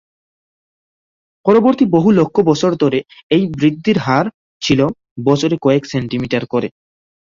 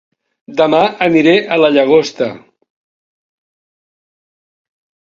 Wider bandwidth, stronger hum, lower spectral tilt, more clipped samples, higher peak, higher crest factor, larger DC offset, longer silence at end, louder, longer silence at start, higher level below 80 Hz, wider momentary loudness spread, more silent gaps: about the same, 7.6 kHz vs 7.6 kHz; neither; about the same, -6.5 dB/octave vs -5.5 dB/octave; neither; about the same, 0 dBFS vs 0 dBFS; about the same, 14 dB vs 16 dB; neither; second, 0.7 s vs 2.65 s; second, -15 LUFS vs -12 LUFS; first, 1.45 s vs 0.5 s; first, -50 dBFS vs -58 dBFS; about the same, 9 LU vs 11 LU; first, 3.23-3.30 s, 4.34-4.60 s, 5.11-5.16 s vs none